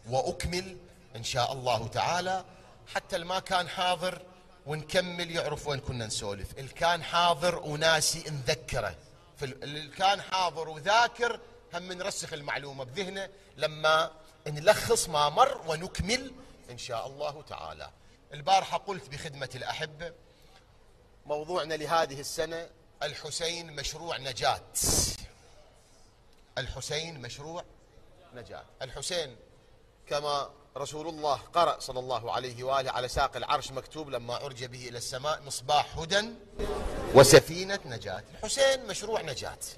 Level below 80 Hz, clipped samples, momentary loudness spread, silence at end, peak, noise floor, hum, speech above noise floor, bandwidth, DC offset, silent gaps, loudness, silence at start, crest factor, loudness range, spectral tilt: -50 dBFS; under 0.1%; 15 LU; 0 s; -2 dBFS; -58 dBFS; none; 28 dB; 13.5 kHz; under 0.1%; none; -30 LUFS; 0.05 s; 28 dB; 11 LU; -3 dB/octave